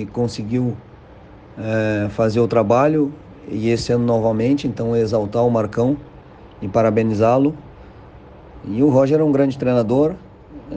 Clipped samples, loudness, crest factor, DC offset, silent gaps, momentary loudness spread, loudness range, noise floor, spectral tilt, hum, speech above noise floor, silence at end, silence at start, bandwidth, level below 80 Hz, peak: under 0.1%; -18 LUFS; 14 dB; under 0.1%; none; 12 LU; 2 LU; -42 dBFS; -8 dB/octave; none; 25 dB; 0 s; 0 s; 9.2 kHz; -46 dBFS; -4 dBFS